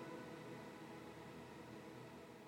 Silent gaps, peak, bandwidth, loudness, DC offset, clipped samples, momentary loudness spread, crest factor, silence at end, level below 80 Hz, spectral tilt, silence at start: none; -40 dBFS; over 20 kHz; -55 LUFS; under 0.1%; under 0.1%; 3 LU; 14 dB; 0 s; -80 dBFS; -5.5 dB/octave; 0 s